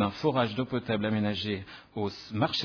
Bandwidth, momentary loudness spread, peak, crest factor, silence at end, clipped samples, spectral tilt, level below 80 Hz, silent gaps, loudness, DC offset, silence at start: 5.4 kHz; 8 LU; -12 dBFS; 18 dB; 0 s; under 0.1%; -6.5 dB/octave; -60 dBFS; none; -30 LUFS; under 0.1%; 0 s